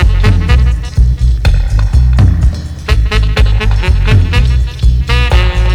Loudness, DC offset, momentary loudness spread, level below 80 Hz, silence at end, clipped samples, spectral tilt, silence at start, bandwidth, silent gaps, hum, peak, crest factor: -11 LUFS; under 0.1%; 4 LU; -10 dBFS; 0 s; 0.6%; -6 dB/octave; 0 s; 9.8 kHz; none; none; 0 dBFS; 8 dB